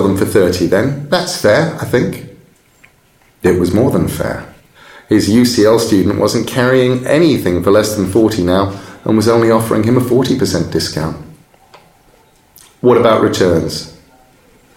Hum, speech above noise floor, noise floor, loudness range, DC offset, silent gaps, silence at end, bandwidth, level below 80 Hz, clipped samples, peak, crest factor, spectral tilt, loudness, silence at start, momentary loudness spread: none; 39 dB; -51 dBFS; 5 LU; under 0.1%; none; 0.85 s; 17 kHz; -42 dBFS; under 0.1%; 0 dBFS; 14 dB; -5.5 dB/octave; -13 LUFS; 0 s; 10 LU